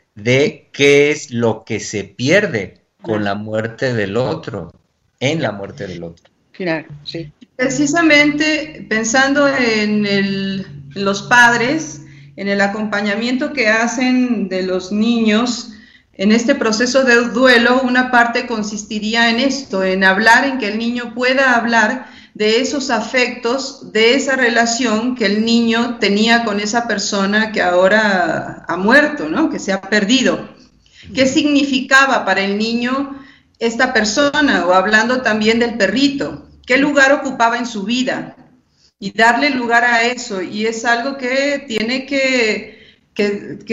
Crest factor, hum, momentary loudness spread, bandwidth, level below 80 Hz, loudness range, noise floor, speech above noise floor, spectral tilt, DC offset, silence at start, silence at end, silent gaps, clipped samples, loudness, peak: 16 dB; none; 12 LU; 11 kHz; -52 dBFS; 5 LU; -54 dBFS; 39 dB; -4 dB/octave; under 0.1%; 0.15 s; 0 s; none; under 0.1%; -15 LUFS; 0 dBFS